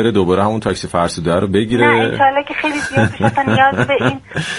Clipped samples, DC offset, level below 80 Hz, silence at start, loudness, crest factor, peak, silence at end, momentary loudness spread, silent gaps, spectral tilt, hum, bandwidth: under 0.1%; under 0.1%; -44 dBFS; 0 s; -15 LUFS; 14 dB; 0 dBFS; 0 s; 6 LU; none; -5.5 dB/octave; none; 11.5 kHz